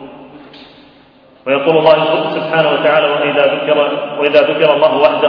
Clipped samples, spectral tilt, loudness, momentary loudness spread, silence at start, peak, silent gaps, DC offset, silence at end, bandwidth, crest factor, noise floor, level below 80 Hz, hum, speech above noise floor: under 0.1%; -7.5 dB/octave; -12 LUFS; 6 LU; 0 s; 0 dBFS; none; under 0.1%; 0 s; 5.4 kHz; 12 dB; -45 dBFS; -58 dBFS; none; 33 dB